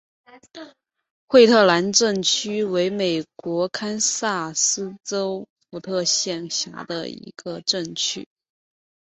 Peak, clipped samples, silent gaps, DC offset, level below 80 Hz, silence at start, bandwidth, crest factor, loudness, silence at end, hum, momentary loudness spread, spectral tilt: -2 dBFS; under 0.1%; 1.10-1.28 s, 5.50-5.56 s; under 0.1%; -66 dBFS; 0.35 s; 8.4 kHz; 20 dB; -21 LUFS; 0.95 s; none; 18 LU; -2.5 dB/octave